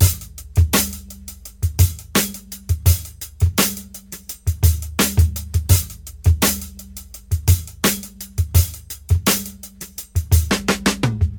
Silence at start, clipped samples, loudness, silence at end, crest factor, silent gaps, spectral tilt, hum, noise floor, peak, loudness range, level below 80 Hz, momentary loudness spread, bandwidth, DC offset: 0 s; under 0.1%; -19 LUFS; 0 s; 18 dB; none; -4 dB/octave; none; -38 dBFS; -2 dBFS; 2 LU; -26 dBFS; 16 LU; 19.5 kHz; under 0.1%